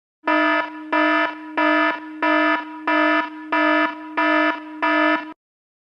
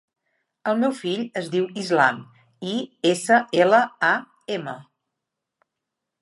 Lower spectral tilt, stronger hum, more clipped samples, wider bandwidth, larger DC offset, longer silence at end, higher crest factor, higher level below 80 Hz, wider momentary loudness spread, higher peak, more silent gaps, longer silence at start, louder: about the same, -3.5 dB/octave vs -4.5 dB/octave; neither; neither; second, 6.6 kHz vs 11.5 kHz; neither; second, 0.5 s vs 1.4 s; second, 14 dB vs 20 dB; about the same, -80 dBFS vs -78 dBFS; second, 6 LU vs 14 LU; about the same, -6 dBFS vs -4 dBFS; neither; second, 0.25 s vs 0.65 s; first, -19 LUFS vs -22 LUFS